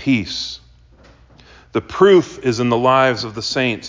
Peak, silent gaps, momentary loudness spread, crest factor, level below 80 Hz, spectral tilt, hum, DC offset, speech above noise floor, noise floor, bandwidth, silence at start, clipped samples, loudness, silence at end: -2 dBFS; none; 13 LU; 16 dB; -48 dBFS; -5.5 dB/octave; none; under 0.1%; 31 dB; -47 dBFS; 7.6 kHz; 0 s; under 0.1%; -16 LUFS; 0 s